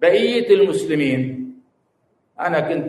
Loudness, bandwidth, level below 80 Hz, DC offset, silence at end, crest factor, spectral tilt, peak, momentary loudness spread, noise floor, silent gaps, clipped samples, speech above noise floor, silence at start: -18 LUFS; 12 kHz; -64 dBFS; under 0.1%; 0 s; 16 dB; -6 dB/octave; -2 dBFS; 13 LU; -66 dBFS; none; under 0.1%; 49 dB; 0 s